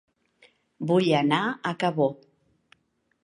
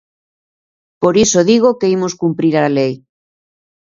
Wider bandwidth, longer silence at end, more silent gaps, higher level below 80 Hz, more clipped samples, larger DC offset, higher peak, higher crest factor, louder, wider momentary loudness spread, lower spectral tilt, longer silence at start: first, 11 kHz vs 8 kHz; first, 1.1 s vs 0.9 s; neither; second, -74 dBFS vs -52 dBFS; neither; neither; second, -6 dBFS vs 0 dBFS; first, 22 dB vs 16 dB; second, -25 LUFS vs -13 LUFS; about the same, 6 LU vs 7 LU; first, -6.5 dB/octave vs -5 dB/octave; second, 0.8 s vs 1 s